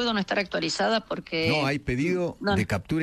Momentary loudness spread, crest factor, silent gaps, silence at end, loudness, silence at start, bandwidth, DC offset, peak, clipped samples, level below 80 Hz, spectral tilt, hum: 3 LU; 14 dB; none; 0 s; -26 LUFS; 0 s; 13 kHz; under 0.1%; -12 dBFS; under 0.1%; -50 dBFS; -5 dB/octave; none